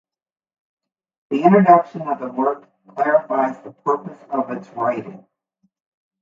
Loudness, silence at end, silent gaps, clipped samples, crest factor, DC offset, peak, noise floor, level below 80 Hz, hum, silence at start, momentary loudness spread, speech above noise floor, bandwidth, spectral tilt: -19 LUFS; 1.05 s; none; under 0.1%; 20 dB; under 0.1%; 0 dBFS; -68 dBFS; -68 dBFS; none; 1.3 s; 15 LU; 50 dB; 7.4 kHz; -9 dB/octave